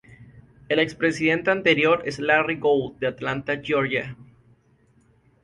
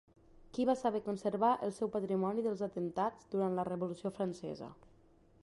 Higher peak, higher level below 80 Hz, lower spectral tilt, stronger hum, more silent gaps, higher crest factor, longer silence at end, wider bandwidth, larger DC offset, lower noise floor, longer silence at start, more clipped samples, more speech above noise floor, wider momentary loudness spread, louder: first, -4 dBFS vs -18 dBFS; first, -58 dBFS vs -70 dBFS; second, -5.5 dB/octave vs -7 dB/octave; neither; neither; about the same, 20 dB vs 18 dB; first, 1.2 s vs 0.7 s; about the same, 11.5 kHz vs 11.5 kHz; neither; second, -60 dBFS vs -65 dBFS; second, 0.1 s vs 0.55 s; neither; first, 38 dB vs 29 dB; about the same, 8 LU vs 10 LU; first, -22 LUFS vs -36 LUFS